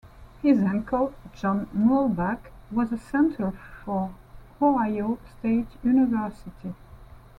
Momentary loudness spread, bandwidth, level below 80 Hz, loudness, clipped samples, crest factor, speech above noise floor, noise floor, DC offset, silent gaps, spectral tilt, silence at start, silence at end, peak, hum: 14 LU; 9.6 kHz; -48 dBFS; -25 LUFS; under 0.1%; 16 dB; 22 dB; -47 dBFS; under 0.1%; none; -9 dB/octave; 0.05 s; 0.35 s; -8 dBFS; none